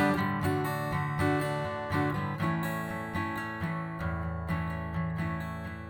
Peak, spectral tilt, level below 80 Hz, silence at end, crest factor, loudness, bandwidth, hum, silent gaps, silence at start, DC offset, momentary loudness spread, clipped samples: -16 dBFS; -7 dB/octave; -48 dBFS; 0 s; 16 dB; -32 LUFS; over 20 kHz; none; none; 0 s; under 0.1%; 6 LU; under 0.1%